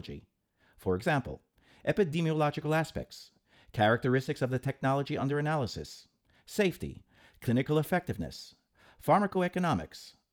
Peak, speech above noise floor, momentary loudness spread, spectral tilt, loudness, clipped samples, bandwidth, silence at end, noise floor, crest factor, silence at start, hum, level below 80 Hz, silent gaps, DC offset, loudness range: -12 dBFS; 37 dB; 19 LU; -6.5 dB/octave; -31 LUFS; under 0.1%; 19.5 kHz; 0.2 s; -68 dBFS; 20 dB; 0.05 s; none; -58 dBFS; none; under 0.1%; 3 LU